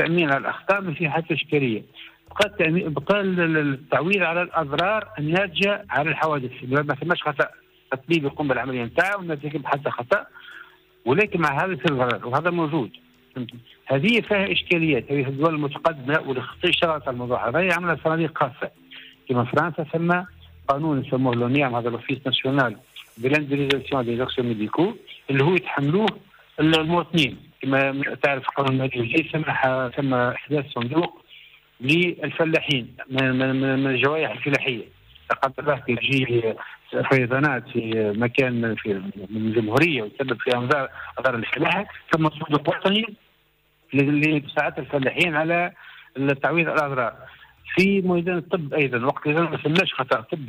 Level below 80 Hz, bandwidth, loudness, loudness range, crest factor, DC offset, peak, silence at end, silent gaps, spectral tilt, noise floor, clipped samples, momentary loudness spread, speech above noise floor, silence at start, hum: -60 dBFS; 15.5 kHz; -22 LUFS; 2 LU; 16 dB; under 0.1%; -8 dBFS; 0 s; none; -6.5 dB/octave; -63 dBFS; under 0.1%; 8 LU; 41 dB; 0 s; none